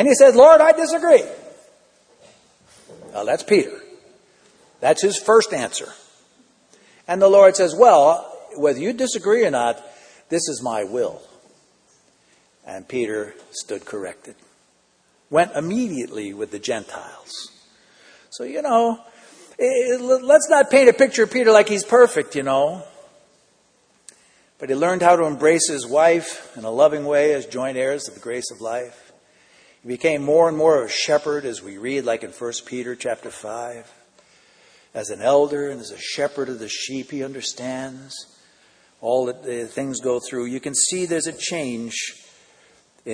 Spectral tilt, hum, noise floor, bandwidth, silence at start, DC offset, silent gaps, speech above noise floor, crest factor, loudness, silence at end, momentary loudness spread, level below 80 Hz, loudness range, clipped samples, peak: -3.5 dB/octave; none; -61 dBFS; 10.5 kHz; 0 s; under 0.1%; none; 43 dB; 20 dB; -18 LUFS; 0 s; 19 LU; -68 dBFS; 12 LU; under 0.1%; 0 dBFS